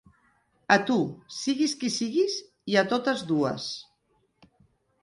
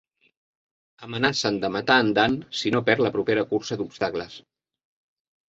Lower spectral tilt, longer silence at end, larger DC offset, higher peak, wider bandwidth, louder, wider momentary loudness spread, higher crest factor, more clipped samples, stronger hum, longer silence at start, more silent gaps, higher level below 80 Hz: about the same, -4 dB/octave vs -4.5 dB/octave; about the same, 1.2 s vs 1.1 s; neither; second, -6 dBFS vs -2 dBFS; first, 11.5 kHz vs 8 kHz; second, -26 LUFS vs -23 LUFS; about the same, 10 LU vs 10 LU; about the same, 22 dB vs 24 dB; neither; neither; second, 0.7 s vs 1 s; neither; second, -70 dBFS vs -60 dBFS